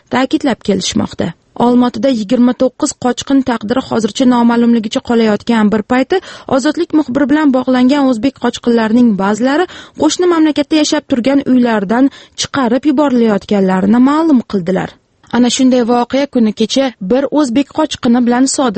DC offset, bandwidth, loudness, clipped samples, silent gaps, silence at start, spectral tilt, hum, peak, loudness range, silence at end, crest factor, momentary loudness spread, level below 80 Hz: under 0.1%; 8.8 kHz; -12 LUFS; under 0.1%; none; 0.1 s; -5 dB/octave; none; 0 dBFS; 1 LU; 0 s; 12 dB; 6 LU; -48 dBFS